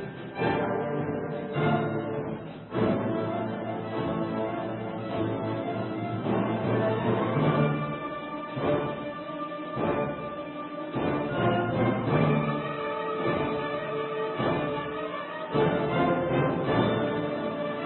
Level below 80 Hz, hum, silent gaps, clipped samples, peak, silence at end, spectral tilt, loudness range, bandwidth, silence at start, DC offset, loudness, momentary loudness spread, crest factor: -54 dBFS; none; none; under 0.1%; -10 dBFS; 0 s; -11 dB/octave; 3 LU; 4.3 kHz; 0 s; under 0.1%; -29 LUFS; 9 LU; 18 dB